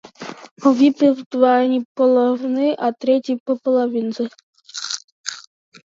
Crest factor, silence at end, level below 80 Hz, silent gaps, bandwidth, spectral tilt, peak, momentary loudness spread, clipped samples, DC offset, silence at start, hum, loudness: 16 dB; 0.55 s; -76 dBFS; 0.51-0.56 s, 1.26-1.31 s, 1.85-1.95 s, 3.40-3.46 s, 4.43-4.53 s, 5.04-5.24 s; 7.8 kHz; -4 dB/octave; -2 dBFS; 15 LU; under 0.1%; under 0.1%; 0.2 s; none; -18 LUFS